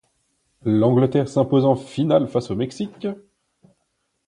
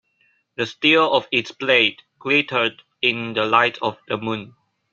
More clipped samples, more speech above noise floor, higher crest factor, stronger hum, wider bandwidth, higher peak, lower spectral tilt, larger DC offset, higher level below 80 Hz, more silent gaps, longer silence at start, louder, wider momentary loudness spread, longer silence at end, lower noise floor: neither; first, 53 dB vs 44 dB; about the same, 18 dB vs 20 dB; neither; first, 10.5 kHz vs 7.4 kHz; about the same, -4 dBFS vs -2 dBFS; first, -8 dB/octave vs -4.5 dB/octave; neither; first, -58 dBFS vs -66 dBFS; neither; about the same, 0.65 s vs 0.6 s; about the same, -20 LUFS vs -19 LUFS; about the same, 13 LU vs 11 LU; first, 1.15 s vs 0.45 s; first, -72 dBFS vs -64 dBFS